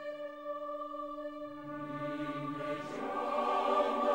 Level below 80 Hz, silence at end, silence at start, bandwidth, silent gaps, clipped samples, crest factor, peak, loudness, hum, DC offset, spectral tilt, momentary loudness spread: -72 dBFS; 0 s; 0 s; 16 kHz; none; under 0.1%; 18 dB; -18 dBFS; -37 LUFS; none; under 0.1%; -6 dB/octave; 12 LU